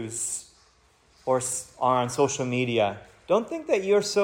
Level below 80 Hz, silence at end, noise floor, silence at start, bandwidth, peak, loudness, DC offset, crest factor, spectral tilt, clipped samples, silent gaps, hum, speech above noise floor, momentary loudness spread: -64 dBFS; 0 s; -61 dBFS; 0 s; 16.5 kHz; -10 dBFS; -26 LUFS; under 0.1%; 18 dB; -4 dB/octave; under 0.1%; none; none; 36 dB; 7 LU